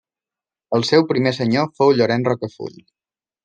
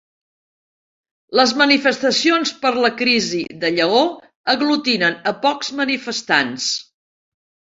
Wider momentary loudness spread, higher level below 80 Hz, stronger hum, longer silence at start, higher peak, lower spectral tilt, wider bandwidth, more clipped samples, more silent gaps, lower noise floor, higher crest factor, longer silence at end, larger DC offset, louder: first, 13 LU vs 8 LU; about the same, -64 dBFS vs -64 dBFS; neither; second, 0.7 s vs 1.3 s; about the same, -2 dBFS vs 0 dBFS; first, -6 dB/octave vs -2.5 dB/octave; first, 9.2 kHz vs 8 kHz; neither; second, none vs 4.35-4.44 s; about the same, -90 dBFS vs under -90 dBFS; about the same, 18 dB vs 18 dB; second, 0.75 s vs 0.95 s; neither; about the same, -18 LUFS vs -17 LUFS